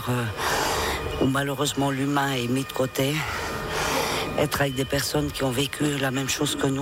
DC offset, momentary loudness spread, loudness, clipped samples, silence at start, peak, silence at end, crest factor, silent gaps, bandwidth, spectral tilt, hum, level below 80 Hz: under 0.1%; 3 LU; -25 LUFS; under 0.1%; 0 s; -10 dBFS; 0 s; 14 dB; none; 18 kHz; -4 dB/octave; none; -44 dBFS